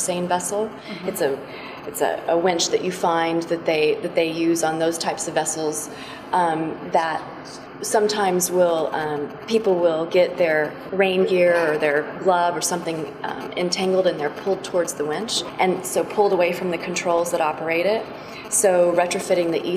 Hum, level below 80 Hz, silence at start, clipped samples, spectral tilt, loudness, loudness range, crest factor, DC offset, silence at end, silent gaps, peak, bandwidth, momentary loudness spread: none; -62 dBFS; 0 s; under 0.1%; -3.5 dB/octave; -21 LUFS; 3 LU; 16 dB; under 0.1%; 0 s; none; -4 dBFS; 15.5 kHz; 10 LU